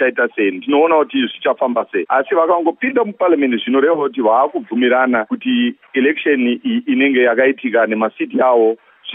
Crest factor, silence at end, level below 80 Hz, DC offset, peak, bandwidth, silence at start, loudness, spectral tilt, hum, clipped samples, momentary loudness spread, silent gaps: 14 dB; 0 s; -76 dBFS; under 0.1%; -2 dBFS; 3.8 kHz; 0 s; -15 LUFS; -9 dB/octave; none; under 0.1%; 5 LU; none